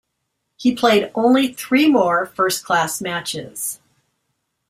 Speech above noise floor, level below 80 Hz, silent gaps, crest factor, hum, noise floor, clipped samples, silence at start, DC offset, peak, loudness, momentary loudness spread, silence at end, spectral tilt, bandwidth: 57 dB; -60 dBFS; none; 18 dB; none; -74 dBFS; under 0.1%; 0.6 s; under 0.1%; -2 dBFS; -18 LUFS; 11 LU; 0.95 s; -3.5 dB/octave; 16 kHz